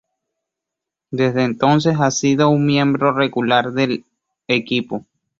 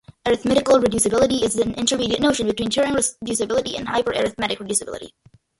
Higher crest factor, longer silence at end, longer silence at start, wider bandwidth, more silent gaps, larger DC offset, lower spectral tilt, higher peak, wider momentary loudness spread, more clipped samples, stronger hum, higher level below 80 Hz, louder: about the same, 18 dB vs 18 dB; about the same, 0.4 s vs 0.5 s; first, 1.1 s vs 0.25 s; second, 7.8 kHz vs 12 kHz; neither; neither; first, -5.5 dB/octave vs -3 dB/octave; about the same, -2 dBFS vs -4 dBFS; about the same, 7 LU vs 7 LU; neither; neither; second, -56 dBFS vs -46 dBFS; first, -17 LUFS vs -20 LUFS